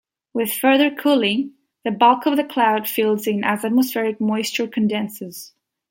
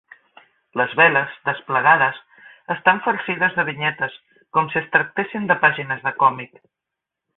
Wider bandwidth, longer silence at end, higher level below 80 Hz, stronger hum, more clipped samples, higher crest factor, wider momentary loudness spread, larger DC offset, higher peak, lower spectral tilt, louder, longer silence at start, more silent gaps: first, 17 kHz vs 4.1 kHz; second, 0.45 s vs 0.9 s; about the same, -70 dBFS vs -66 dBFS; neither; neither; about the same, 18 dB vs 20 dB; about the same, 13 LU vs 12 LU; neither; about the same, -2 dBFS vs -2 dBFS; second, -4.5 dB/octave vs -9.5 dB/octave; about the same, -19 LUFS vs -19 LUFS; second, 0.35 s vs 0.75 s; neither